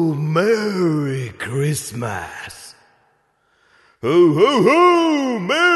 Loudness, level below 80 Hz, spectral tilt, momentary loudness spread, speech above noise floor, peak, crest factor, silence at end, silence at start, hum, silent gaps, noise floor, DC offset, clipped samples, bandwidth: -17 LUFS; -58 dBFS; -5.5 dB/octave; 15 LU; 46 dB; -2 dBFS; 16 dB; 0 s; 0 s; none; none; -62 dBFS; under 0.1%; under 0.1%; 12 kHz